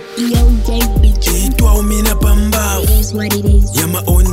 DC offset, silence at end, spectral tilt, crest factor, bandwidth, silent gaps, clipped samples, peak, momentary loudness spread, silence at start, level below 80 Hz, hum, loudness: under 0.1%; 0 s; -5 dB/octave; 10 dB; 16.5 kHz; none; under 0.1%; 0 dBFS; 3 LU; 0 s; -12 dBFS; none; -13 LUFS